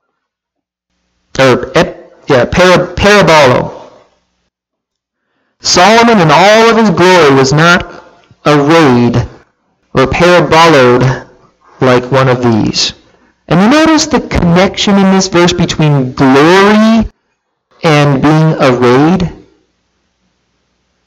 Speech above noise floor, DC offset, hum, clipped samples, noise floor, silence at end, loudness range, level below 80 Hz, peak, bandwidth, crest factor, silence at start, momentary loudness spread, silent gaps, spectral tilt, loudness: 69 dB; under 0.1%; none; 0.3%; -76 dBFS; 1.7 s; 4 LU; -32 dBFS; 0 dBFS; 16.5 kHz; 8 dB; 1.35 s; 9 LU; none; -5 dB/octave; -7 LUFS